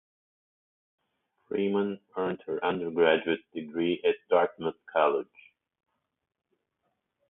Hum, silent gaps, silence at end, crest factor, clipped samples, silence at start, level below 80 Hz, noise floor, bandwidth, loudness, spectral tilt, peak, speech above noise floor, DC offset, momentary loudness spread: none; none; 2.05 s; 22 dB; under 0.1%; 1.5 s; -72 dBFS; -80 dBFS; 3.9 kHz; -29 LUFS; -9.5 dB/octave; -10 dBFS; 52 dB; under 0.1%; 9 LU